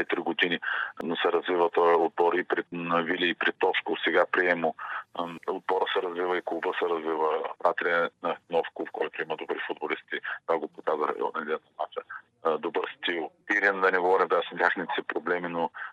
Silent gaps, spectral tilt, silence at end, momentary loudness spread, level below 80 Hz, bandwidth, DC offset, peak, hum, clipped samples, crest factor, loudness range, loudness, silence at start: none; -5.5 dB/octave; 0 s; 10 LU; -84 dBFS; 7.4 kHz; under 0.1%; -6 dBFS; none; under 0.1%; 22 dB; 6 LU; -28 LUFS; 0 s